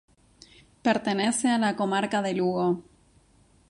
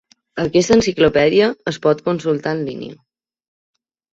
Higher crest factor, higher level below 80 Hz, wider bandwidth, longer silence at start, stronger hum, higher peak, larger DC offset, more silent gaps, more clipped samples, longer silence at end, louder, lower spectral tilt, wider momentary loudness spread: about the same, 20 dB vs 16 dB; second, -64 dBFS vs -46 dBFS; first, 11.5 kHz vs 7.8 kHz; first, 0.85 s vs 0.35 s; neither; second, -8 dBFS vs -2 dBFS; neither; neither; neither; second, 0.9 s vs 1.2 s; second, -26 LUFS vs -17 LUFS; about the same, -4.5 dB/octave vs -5 dB/octave; second, 4 LU vs 15 LU